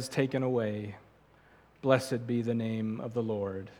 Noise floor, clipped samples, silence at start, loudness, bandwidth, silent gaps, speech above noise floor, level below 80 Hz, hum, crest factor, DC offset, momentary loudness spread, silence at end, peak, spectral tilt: -61 dBFS; under 0.1%; 0 s; -32 LUFS; 17 kHz; none; 30 dB; -70 dBFS; none; 22 dB; under 0.1%; 8 LU; 0.05 s; -10 dBFS; -6.5 dB/octave